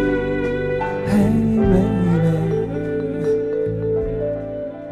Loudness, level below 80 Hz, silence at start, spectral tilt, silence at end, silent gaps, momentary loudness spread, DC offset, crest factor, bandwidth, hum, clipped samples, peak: -20 LUFS; -34 dBFS; 0 s; -9 dB/octave; 0 s; none; 7 LU; under 0.1%; 14 dB; 13 kHz; none; under 0.1%; -4 dBFS